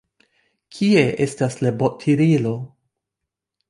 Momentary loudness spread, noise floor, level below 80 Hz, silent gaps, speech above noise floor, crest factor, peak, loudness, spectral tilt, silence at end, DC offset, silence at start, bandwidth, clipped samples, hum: 9 LU; -83 dBFS; -58 dBFS; none; 65 dB; 18 dB; -2 dBFS; -19 LUFS; -7 dB/octave; 1 s; under 0.1%; 0.75 s; 11.5 kHz; under 0.1%; none